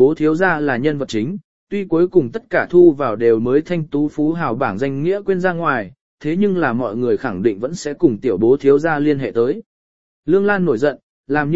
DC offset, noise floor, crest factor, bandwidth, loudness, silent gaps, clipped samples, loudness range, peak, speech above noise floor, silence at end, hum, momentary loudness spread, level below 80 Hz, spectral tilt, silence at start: 1%; under -90 dBFS; 16 dB; 8 kHz; -17 LUFS; 1.44-1.67 s, 6.01-6.18 s, 9.66-10.23 s, 11.03-11.24 s; under 0.1%; 3 LU; 0 dBFS; over 74 dB; 0 s; none; 9 LU; -52 dBFS; -7.5 dB/octave; 0 s